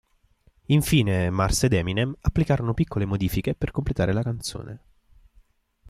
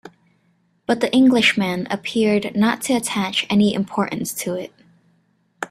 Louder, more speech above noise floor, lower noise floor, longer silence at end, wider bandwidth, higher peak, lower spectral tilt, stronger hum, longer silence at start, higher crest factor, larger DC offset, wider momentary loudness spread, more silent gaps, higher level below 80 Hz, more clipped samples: second, -24 LUFS vs -19 LUFS; second, 38 dB vs 44 dB; about the same, -62 dBFS vs -63 dBFS; first, 1.1 s vs 0.05 s; about the same, 15.5 kHz vs 15 kHz; second, -8 dBFS vs -2 dBFS; first, -6 dB/octave vs -4.5 dB/octave; neither; first, 0.7 s vs 0.05 s; about the same, 18 dB vs 18 dB; neither; about the same, 10 LU vs 12 LU; neither; first, -38 dBFS vs -60 dBFS; neither